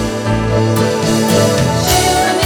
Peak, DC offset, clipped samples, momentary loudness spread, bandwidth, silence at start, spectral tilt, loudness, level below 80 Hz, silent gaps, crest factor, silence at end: 0 dBFS; under 0.1%; under 0.1%; 4 LU; over 20 kHz; 0 s; -4.5 dB/octave; -13 LUFS; -30 dBFS; none; 12 dB; 0 s